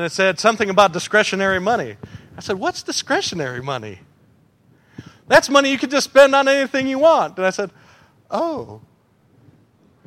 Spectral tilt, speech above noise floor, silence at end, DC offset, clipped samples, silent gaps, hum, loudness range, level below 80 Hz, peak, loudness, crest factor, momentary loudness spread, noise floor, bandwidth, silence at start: -3.5 dB/octave; 39 dB; 1.3 s; under 0.1%; under 0.1%; none; none; 8 LU; -56 dBFS; 0 dBFS; -17 LUFS; 20 dB; 17 LU; -56 dBFS; 15.5 kHz; 0 s